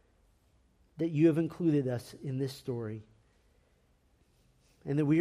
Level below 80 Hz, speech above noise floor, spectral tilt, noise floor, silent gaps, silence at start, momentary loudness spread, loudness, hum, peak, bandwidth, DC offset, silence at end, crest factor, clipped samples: -68 dBFS; 39 dB; -8.5 dB/octave; -69 dBFS; none; 1 s; 13 LU; -32 LUFS; none; -14 dBFS; 14 kHz; under 0.1%; 0 s; 18 dB; under 0.1%